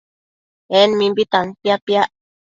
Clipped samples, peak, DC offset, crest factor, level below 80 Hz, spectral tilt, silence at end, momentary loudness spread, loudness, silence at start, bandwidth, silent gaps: under 0.1%; 0 dBFS; under 0.1%; 18 dB; -62 dBFS; -5 dB/octave; 0.45 s; 6 LU; -17 LUFS; 0.7 s; 7.6 kHz; 1.82-1.87 s